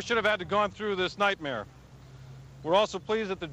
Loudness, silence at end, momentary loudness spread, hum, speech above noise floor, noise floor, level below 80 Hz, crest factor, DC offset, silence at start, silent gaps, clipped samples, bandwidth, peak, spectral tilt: -28 LUFS; 0 s; 21 LU; none; 21 dB; -49 dBFS; -58 dBFS; 18 dB; under 0.1%; 0 s; none; under 0.1%; 11.5 kHz; -12 dBFS; -4.5 dB/octave